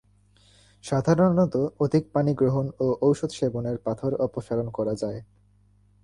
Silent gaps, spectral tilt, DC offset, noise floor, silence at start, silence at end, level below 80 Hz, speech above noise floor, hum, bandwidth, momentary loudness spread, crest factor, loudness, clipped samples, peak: none; -8 dB/octave; under 0.1%; -60 dBFS; 0.85 s; 0.8 s; -56 dBFS; 36 dB; 50 Hz at -50 dBFS; 11.5 kHz; 9 LU; 16 dB; -25 LUFS; under 0.1%; -8 dBFS